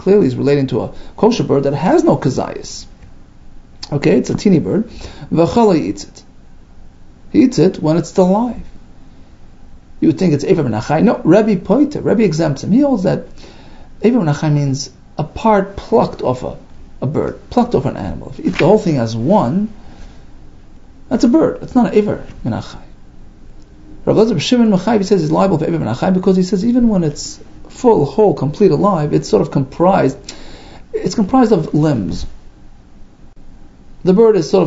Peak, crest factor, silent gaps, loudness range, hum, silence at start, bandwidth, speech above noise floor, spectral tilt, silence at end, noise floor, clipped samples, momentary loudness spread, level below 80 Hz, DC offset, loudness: 0 dBFS; 14 dB; none; 4 LU; none; 0 s; 8 kHz; 25 dB; -7 dB/octave; 0 s; -38 dBFS; under 0.1%; 13 LU; -36 dBFS; under 0.1%; -14 LUFS